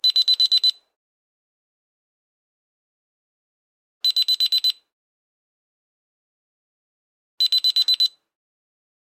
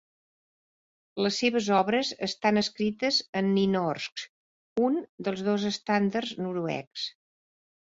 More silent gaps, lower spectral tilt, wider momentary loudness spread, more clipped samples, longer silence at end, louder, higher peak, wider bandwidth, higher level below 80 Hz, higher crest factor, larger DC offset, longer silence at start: first, 0.96-4.01 s, 4.93-7.38 s vs 3.29-3.33 s, 4.12-4.16 s, 4.29-4.76 s, 5.09-5.18 s, 6.87-6.91 s; second, 7 dB/octave vs -5 dB/octave; second, 7 LU vs 11 LU; neither; about the same, 0.95 s vs 0.85 s; first, -17 LUFS vs -28 LUFS; about the same, -8 dBFS vs -10 dBFS; first, 16.5 kHz vs 7.8 kHz; second, under -90 dBFS vs -68 dBFS; about the same, 16 dB vs 20 dB; neither; second, 0.05 s vs 1.15 s